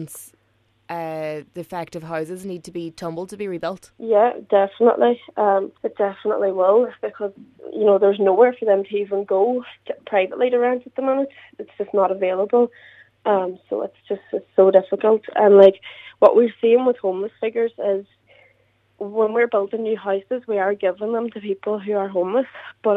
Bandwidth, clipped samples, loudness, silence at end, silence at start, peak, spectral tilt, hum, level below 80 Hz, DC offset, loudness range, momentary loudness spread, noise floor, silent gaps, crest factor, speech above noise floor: 13.5 kHz; under 0.1%; -20 LUFS; 0 s; 0 s; 0 dBFS; -6.5 dB/octave; none; -70 dBFS; under 0.1%; 7 LU; 15 LU; -63 dBFS; none; 20 dB; 44 dB